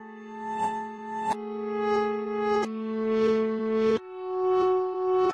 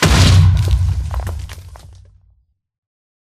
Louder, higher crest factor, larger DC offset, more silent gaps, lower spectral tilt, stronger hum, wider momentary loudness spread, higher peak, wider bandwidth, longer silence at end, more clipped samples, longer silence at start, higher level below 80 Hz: second, -27 LUFS vs -14 LUFS; about the same, 12 dB vs 16 dB; neither; neither; about the same, -6 dB/octave vs -5 dB/octave; neither; second, 10 LU vs 21 LU; second, -14 dBFS vs 0 dBFS; second, 10 kHz vs 14.5 kHz; second, 0 s vs 1.35 s; neither; about the same, 0 s vs 0 s; second, -64 dBFS vs -22 dBFS